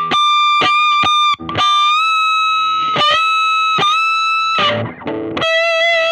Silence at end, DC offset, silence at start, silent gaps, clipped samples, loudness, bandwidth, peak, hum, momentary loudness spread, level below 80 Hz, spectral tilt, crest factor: 0 s; under 0.1%; 0 s; none; under 0.1%; -12 LUFS; 12 kHz; -2 dBFS; none; 4 LU; -54 dBFS; -2.5 dB/octave; 12 dB